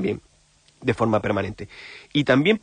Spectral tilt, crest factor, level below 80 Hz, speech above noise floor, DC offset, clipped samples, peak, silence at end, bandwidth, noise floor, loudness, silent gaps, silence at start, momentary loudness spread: -6.5 dB/octave; 16 dB; -52 dBFS; 36 dB; under 0.1%; under 0.1%; -6 dBFS; 0.05 s; 9.8 kHz; -59 dBFS; -23 LUFS; none; 0 s; 19 LU